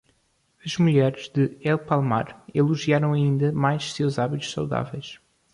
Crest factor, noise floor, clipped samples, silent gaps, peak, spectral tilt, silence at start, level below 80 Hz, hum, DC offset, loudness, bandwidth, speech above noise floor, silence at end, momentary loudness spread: 16 dB; -67 dBFS; under 0.1%; none; -6 dBFS; -6.5 dB/octave; 0.65 s; -58 dBFS; none; under 0.1%; -24 LUFS; 11 kHz; 44 dB; 0.4 s; 9 LU